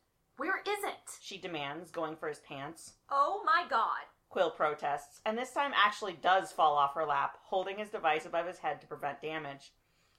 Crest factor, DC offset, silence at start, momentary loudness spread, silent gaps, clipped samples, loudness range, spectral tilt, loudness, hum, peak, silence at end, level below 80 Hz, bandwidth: 22 dB; under 0.1%; 0.4 s; 14 LU; none; under 0.1%; 5 LU; -3 dB/octave; -33 LUFS; none; -12 dBFS; 0.5 s; -74 dBFS; 16 kHz